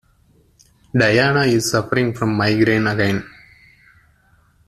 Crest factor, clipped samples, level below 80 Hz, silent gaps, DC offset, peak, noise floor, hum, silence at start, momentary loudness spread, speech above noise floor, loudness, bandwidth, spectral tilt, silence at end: 18 dB; under 0.1%; -50 dBFS; none; under 0.1%; -2 dBFS; -56 dBFS; none; 0.95 s; 6 LU; 39 dB; -17 LUFS; 14 kHz; -5.5 dB/octave; 1.4 s